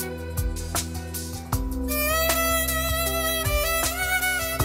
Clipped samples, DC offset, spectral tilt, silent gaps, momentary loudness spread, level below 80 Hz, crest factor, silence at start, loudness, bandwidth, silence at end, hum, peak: under 0.1%; under 0.1%; -3 dB/octave; none; 9 LU; -32 dBFS; 16 dB; 0 s; -24 LUFS; 16.5 kHz; 0 s; none; -8 dBFS